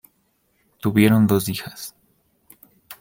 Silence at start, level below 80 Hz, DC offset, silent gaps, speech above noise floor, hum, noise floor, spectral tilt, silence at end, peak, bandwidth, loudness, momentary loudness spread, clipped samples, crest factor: 0.85 s; -56 dBFS; under 0.1%; none; 48 dB; none; -66 dBFS; -6 dB/octave; 0.1 s; -2 dBFS; 17 kHz; -19 LUFS; 21 LU; under 0.1%; 20 dB